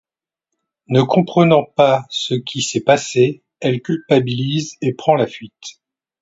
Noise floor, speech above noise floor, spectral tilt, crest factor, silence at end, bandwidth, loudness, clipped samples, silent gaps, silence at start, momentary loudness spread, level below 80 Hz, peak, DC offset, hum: -81 dBFS; 65 dB; -5.5 dB/octave; 18 dB; 0.5 s; 8 kHz; -17 LUFS; under 0.1%; none; 0.9 s; 10 LU; -60 dBFS; 0 dBFS; under 0.1%; none